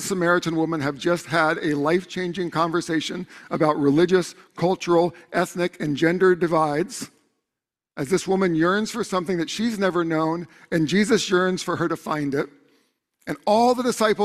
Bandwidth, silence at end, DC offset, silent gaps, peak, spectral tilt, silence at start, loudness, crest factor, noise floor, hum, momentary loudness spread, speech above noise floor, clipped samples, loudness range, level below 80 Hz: 14 kHz; 0 s; under 0.1%; none; -4 dBFS; -5 dB/octave; 0 s; -22 LUFS; 18 dB; -87 dBFS; none; 10 LU; 65 dB; under 0.1%; 2 LU; -60 dBFS